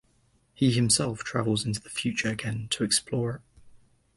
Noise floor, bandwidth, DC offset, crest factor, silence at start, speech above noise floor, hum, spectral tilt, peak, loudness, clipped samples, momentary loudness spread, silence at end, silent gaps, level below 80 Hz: -66 dBFS; 12 kHz; under 0.1%; 20 dB; 0.6 s; 39 dB; none; -4 dB/octave; -10 dBFS; -27 LUFS; under 0.1%; 8 LU; 0.4 s; none; -56 dBFS